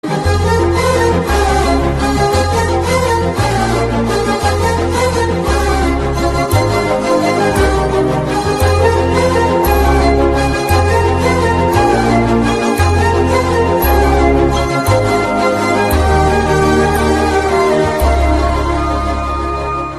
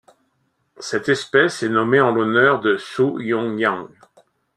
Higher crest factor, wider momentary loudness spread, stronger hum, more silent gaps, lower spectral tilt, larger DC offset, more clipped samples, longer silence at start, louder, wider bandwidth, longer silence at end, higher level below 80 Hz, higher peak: second, 12 dB vs 18 dB; second, 3 LU vs 8 LU; neither; neither; about the same, -6 dB/octave vs -5 dB/octave; neither; neither; second, 0.05 s vs 0.8 s; first, -13 LUFS vs -18 LUFS; first, 13.5 kHz vs 11 kHz; second, 0 s vs 0.7 s; first, -20 dBFS vs -64 dBFS; about the same, 0 dBFS vs -2 dBFS